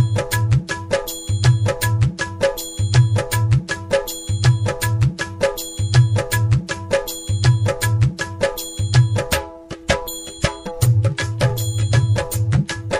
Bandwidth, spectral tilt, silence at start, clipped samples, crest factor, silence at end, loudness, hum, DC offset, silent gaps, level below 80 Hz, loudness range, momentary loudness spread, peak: 16 kHz; -5 dB/octave; 0 s; under 0.1%; 16 dB; 0 s; -19 LUFS; none; under 0.1%; none; -34 dBFS; 1 LU; 7 LU; -2 dBFS